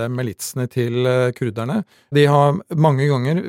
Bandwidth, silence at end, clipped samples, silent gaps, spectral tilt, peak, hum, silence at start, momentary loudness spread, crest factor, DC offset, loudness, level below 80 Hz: 16.5 kHz; 0 s; under 0.1%; none; -6.5 dB/octave; -2 dBFS; none; 0 s; 10 LU; 16 dB; under 0.1%; -19 LUFS; -62 dBFS